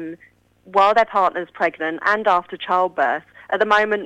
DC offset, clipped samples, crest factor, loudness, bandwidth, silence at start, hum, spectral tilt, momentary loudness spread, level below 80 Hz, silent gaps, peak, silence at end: under 0.1%; under 0.1%; 18 dB; -19 LUFS; 9.6 kHz; 0 s; none; -4.5 dB/octave; 7 LU; -62 dBFS; none; -2 dBFS; 0 s